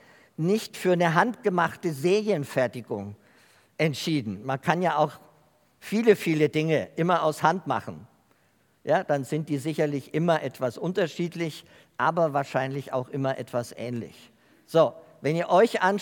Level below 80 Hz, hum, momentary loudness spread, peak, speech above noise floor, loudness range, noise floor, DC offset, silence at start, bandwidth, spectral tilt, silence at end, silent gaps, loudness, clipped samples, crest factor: -76 dBFS; none; 12 LU; -4 dBFS; 40 dB; 3 LU; -66 dBFS; under 0.1%; 0.4 s; 18 kHz; -6 dB/octave; 0 s; none; -26 LUFS; under 0.1%; 22 dB